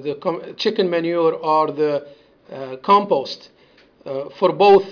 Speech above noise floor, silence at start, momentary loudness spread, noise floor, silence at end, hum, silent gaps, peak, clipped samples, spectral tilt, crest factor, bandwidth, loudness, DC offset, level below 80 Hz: 34 dB; 0 s; 17 LU; -52 dBFS; 0 s; none; none; -4 dBFS; under 0.1%; -6.5 dB/octave; 16 dB; 5.4 kHz; -19 LUFS; under 0.1%; -62 dBFS